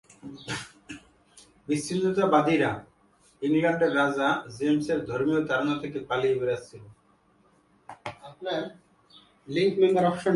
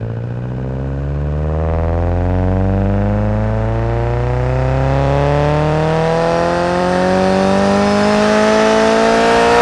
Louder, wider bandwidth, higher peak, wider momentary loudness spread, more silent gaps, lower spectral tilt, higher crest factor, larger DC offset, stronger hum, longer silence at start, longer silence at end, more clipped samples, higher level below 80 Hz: second, -26 LUFS vs -15 LUFS; about the same, 11.5 kHz vs 12 kHz; second, -6 dBFS vs 0 dBFS; first, 19 LU vs 9 LU; neither; about the same, -6 dB/octave vs -6.5 dB/octave; first, 20 dB vs 14 dB; neither; neither; first, 0.25 s vs 0 s; about the same, 0 s vs 0 s; neither; second, -64 dBFS vs -24 dBFS